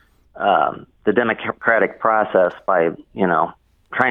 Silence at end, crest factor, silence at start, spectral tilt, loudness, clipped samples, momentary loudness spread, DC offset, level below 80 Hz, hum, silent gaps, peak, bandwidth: 0 s; 18 dB; 0.35 s; -8 dB/octave; -19 LUFS; under 0.1%; 6 LU; under 0.1%; -58 dBFS; none; none; 0 dBFS; 4.2 kHz